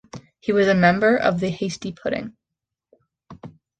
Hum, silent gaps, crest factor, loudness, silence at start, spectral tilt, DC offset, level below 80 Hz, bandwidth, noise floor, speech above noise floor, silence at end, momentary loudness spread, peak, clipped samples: none; none; 18 dB; -20 LUFS; 0.15 s; -6 dB/octave; under 0.1%; -56 dBFS; 9 kHz; -85 dBFS; 65 dB; 0.3 s; 14 LU; -4 dBFS; under 0.1%